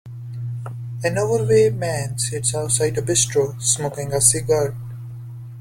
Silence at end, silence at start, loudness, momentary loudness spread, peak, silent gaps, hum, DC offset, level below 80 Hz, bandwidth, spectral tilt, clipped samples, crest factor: 0 s; 0.05 s; -19 LUFS; 18 LU; 0 dBFS; none; none; under 0.1%; -48 dBFS; 16.5 kHz; -3.5 dB/octave; under 0.1%; 20 dB